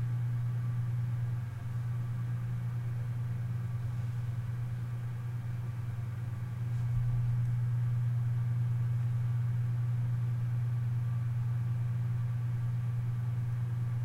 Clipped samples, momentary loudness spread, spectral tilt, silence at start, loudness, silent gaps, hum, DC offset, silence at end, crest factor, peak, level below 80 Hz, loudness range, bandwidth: under 0.1%; 6 LU; -8.5 dB/octave; 0 s; -34 LUFS; none; none; under 0.1%; 0 s; 12 dB; -22 dBFS; -54 dBFS; 4 LU; 3.8 kHz